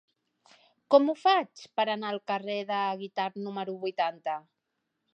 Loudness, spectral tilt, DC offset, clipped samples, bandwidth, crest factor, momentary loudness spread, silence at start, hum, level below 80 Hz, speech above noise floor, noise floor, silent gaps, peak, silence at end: -29 LUFS; -5.5 dB/octave; under 0.1%; under 0.1%; 8.6 kHz; 22 dB; 12 LU; 0.9 s; none; -90 dBFS; 53 dB; -82 dBFS; none; -8 dBFS; 0.75 s